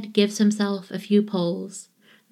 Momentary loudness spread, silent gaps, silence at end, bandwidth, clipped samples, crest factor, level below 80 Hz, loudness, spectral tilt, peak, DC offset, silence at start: 13 LU; none; 0.5 s; 13 kHz; under 0.1%; 18 dB; -82 dBFS; -23 LUFS; -5.5 dB/octave; -6 dBFS; under 0.1%; 0 s